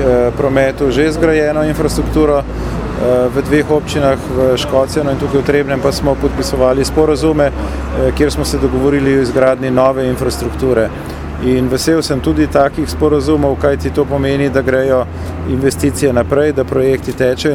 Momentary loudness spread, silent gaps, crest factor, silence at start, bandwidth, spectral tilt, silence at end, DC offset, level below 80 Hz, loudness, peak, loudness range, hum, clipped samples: 4 LU; none; 12 dB; 0 s; 17 kHz; -6 dB/octave; 0 s; under 0.1%; -26 dBFS; -13 LUFS; 0 dBFS; 1 LU; none; under 0.1%